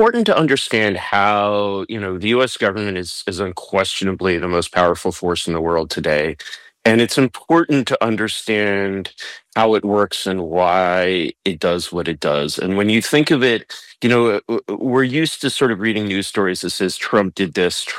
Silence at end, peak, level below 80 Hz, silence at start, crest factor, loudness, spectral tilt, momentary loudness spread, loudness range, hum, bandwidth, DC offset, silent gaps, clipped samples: 0 s; -4 dBFS; -54 dBFS; 0 s; 14 dB; -18 LUFS; -4.5 dB/octave; 8 LU; 2 LU; none; 16 kHz; under 0.1%; none; under 0.1%